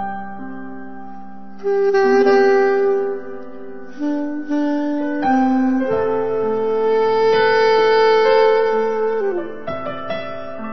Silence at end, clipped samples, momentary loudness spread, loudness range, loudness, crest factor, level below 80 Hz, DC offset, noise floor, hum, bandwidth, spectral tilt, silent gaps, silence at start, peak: 0 s; under 0.1%; 20 LU; 4 LU; -17 LUFS; 14 dB; -58 dBFS; 3%; -37 dBFS; none; 6.2 kHz; -5.5 dB/octave; none; 0 s; -2 dBFS